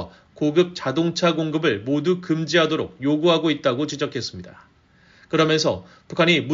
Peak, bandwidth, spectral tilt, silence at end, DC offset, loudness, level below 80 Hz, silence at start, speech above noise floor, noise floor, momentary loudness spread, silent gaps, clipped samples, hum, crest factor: -4 dBFS; 7.6 kHz; -4 dB/octave; 0 s; under 0.1%; -21 LUFS; -60 dBFS; 0 s; 34 dB; -55 dBFS; 10 LU; none; under 0.1%; none; 18 dB